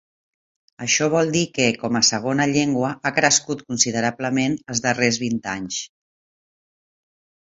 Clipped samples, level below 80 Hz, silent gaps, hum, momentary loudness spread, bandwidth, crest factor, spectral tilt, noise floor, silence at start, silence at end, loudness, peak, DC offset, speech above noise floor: under 0.1%; -60 dBFS; none; none; 9 LU; 8 kHz; 20 dB; -3 dB/octave; under -90 dBFS; 0.8 s; 1.75 s; -20 LUFS; -2 dBFS; under 0.1%; over 69 dB